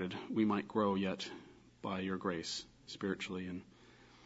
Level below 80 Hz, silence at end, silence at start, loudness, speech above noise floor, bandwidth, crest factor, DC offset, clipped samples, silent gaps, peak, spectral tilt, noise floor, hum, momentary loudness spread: -72 dBFS; 0 s; 0 s; -38 LUFS; 24 dB; 7.6 kHz; 20 dB; under 0.1%; under 0.1%; none; -20 dBFS; -4.5 dB/octave; -62 dBFS; none; 13 LU